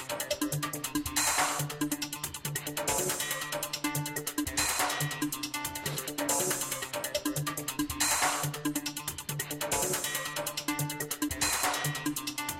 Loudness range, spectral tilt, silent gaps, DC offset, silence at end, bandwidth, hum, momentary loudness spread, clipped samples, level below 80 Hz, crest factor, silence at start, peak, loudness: 1 LU; -2.5 dB/octave; none; under 0.1%; 0 s; 16.5 kHz; none; 7 LU; under 0.1%; -56 dBFS; 20 dB; 0 s; -12 dBFS; -31 LUFS